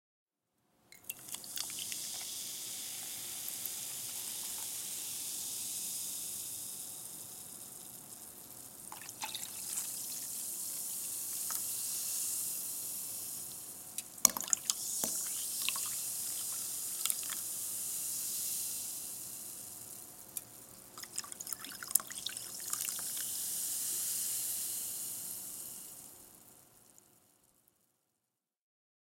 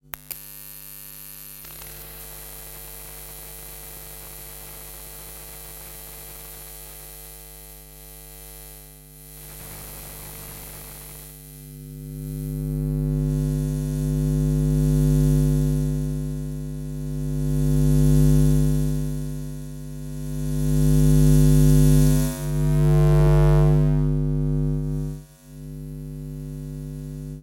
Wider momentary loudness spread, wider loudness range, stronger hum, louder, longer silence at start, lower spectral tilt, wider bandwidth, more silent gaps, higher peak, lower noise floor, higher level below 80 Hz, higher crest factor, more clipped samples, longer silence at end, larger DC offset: second, 12 LU vs 22 LU; second, 9 LU vs 19 LU; neither; second, -37 LUFS vs -21 LUFS; first, 0.9 s vs 0.15 s; second, 1 dB/octave vs -7.5 dB/octave; about the same, 17 kHz vs 17 kHz; neither; first, 0 dBFS vs -6 dBFS; first, -87 dBFS vs -44 dBFS; second, -78 dBFS vs -30 dBFS; first, 40 dB vs 18 dB; neither; first, 2.05 s vs 0 s; neither